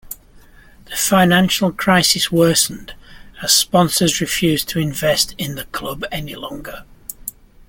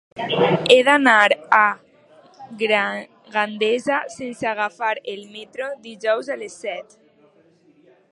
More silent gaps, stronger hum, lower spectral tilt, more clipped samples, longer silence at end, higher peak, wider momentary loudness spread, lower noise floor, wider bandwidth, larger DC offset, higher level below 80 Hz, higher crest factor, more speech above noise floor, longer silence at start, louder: neither; neither; about the same, -3.5 dB/octave vs -4 dB/octave; neither; second, 0.4 s vs 1.3 s; about the same, 0 dBFS vs 0 dBFS; about the same, 19 LU vs 18 LU; second, -45 dBFS vs -56 dBFS; first, 17 kHz vs 11.5 kHz; neither; first, -44 dBFS vs -70 dBFS; about the same, 18 dB vs 20 dB; second, 28 dB vs 36 dB; about the same, 0.05 s vs 0.15 s; first, -16 LUFS vs -19 LUFS